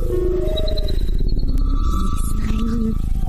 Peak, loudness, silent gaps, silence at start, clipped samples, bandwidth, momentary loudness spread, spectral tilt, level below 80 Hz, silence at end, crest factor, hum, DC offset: -8 dBFS; -23 LUFS; none; 0 s; under 0.1%; 13 kHz; 2 LU; -7 dB/octave; -18 dBFS; 0 s; 10 dB; none; 0.9%